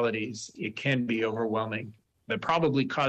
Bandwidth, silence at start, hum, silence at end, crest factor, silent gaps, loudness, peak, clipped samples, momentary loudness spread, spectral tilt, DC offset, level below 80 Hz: 9 kHz; 0 s; none; 0 s; 14 dB; none; -29 LUFS; -14 dBFS; under 0.1%; 10 LU; -5.5 dB/octave; under 0.1%; -66 dBFS